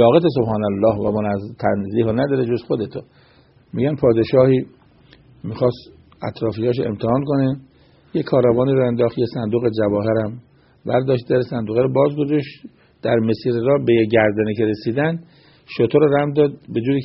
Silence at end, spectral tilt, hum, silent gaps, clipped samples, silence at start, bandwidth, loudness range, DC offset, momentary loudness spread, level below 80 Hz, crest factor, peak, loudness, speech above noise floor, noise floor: 0 s; -7 dB/octave; none; none; under 0.1%; 0 s; 5.8 kHz; 3 LU; under 0.1%; 13 LU; -52 dBFS; 18 dB; 0 dBFS; -19 LUFS; 32 dB; -50 dBFS